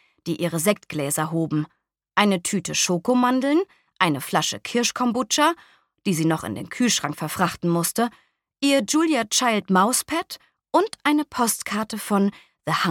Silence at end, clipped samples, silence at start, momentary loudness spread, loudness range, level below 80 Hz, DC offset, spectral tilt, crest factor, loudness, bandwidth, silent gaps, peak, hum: 0 s; under 0.1%; 0.25 s; 8 LU; 2 LU; -64 dBFS; under 0.1%; -3.5 dB/octave; 20 dB; -22 LUFS; 19 kHz; none; -2 dBFS; none